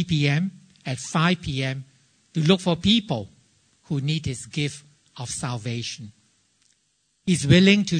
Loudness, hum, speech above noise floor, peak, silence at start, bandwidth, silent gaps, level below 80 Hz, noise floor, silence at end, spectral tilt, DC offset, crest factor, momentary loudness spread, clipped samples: -23 LUFS; none; 47 dB; -2 dBFS; 0 s; 9.6 kHz; none; -50 dBFS; -69 dBFS; 0 s; -5 dB/octave; under 0.1%; 22 dB; 15 LU; under 0.1%